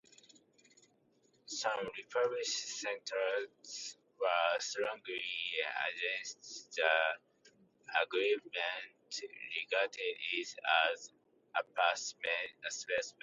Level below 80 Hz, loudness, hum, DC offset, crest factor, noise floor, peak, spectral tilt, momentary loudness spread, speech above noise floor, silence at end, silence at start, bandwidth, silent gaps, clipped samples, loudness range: -86 dBFS; -36 LUFS; none; under 0.1%; 22 dB; -72 dBFS; -16 dBFS; 0 dB/octave; 13 LU; 36 dB; 0.1 s; 1.5 s; 8.2 kHz; none; under 0.1%; 3 LU